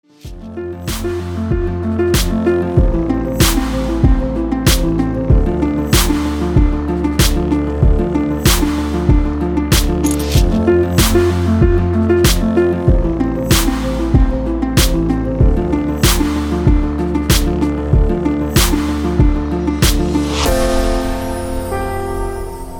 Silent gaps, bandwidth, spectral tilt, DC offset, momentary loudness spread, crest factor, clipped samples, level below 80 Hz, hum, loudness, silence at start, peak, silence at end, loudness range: none; over 20 kHz; -5.5 dB/octave; under 0.1%; 7 LU; 14 dB; under 0.1%; -18 dBFS; none; -15 LUFS; 0.25 s; 0 dBFS; 0 s; 3 LU